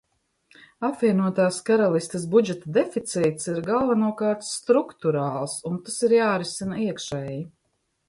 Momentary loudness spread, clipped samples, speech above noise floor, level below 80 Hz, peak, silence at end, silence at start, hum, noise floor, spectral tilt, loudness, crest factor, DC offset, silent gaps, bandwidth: 9 LU; under 0.1%; 50 dB; -62 dBFS; -6 dBFS; 0.6 s; 0.8 s; none; -73 dBFS; -5.5 dB/octave; -24 LUFS; 18 dB; under 0.1%; none; 11.5 kHz